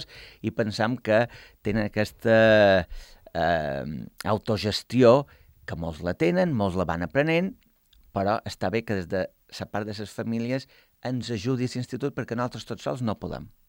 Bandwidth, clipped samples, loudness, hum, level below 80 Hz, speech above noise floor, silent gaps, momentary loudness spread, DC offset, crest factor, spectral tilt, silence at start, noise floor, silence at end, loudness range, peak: 16.5 kHz; under 0.1%; -26 LUFS; none; -52 dBFS; 34 dB; none; 15 LU; under 0.1%; 20 dB; -6.5 dB/octave; 0 s; -59 dBFS; 0.2 s; 7 LU; -6 dBFS